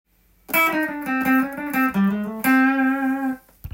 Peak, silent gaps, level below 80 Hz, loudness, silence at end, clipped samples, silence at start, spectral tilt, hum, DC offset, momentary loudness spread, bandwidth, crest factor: -6 dBFS; none; -52 dBFS; -20 LUFS; 0.05 s; under 0.1%; 0.5 s; -5.5 dB/octave; none; under 0.1%; 7 LU; 17 kHz; 16 dB